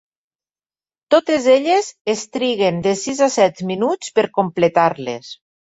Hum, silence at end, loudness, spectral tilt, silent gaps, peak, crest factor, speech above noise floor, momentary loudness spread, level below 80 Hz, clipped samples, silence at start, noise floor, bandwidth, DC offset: none; 0.45 s; -17 LUFS; -4.5 dB/octave; 2.01-2.05 s; -2 dBFS; 16 dB; over 73 dB; 8 LU; -60 dBFS; under 0.1%; 1.1 s; under -90 dBFS; 8 kHz; under 0.1%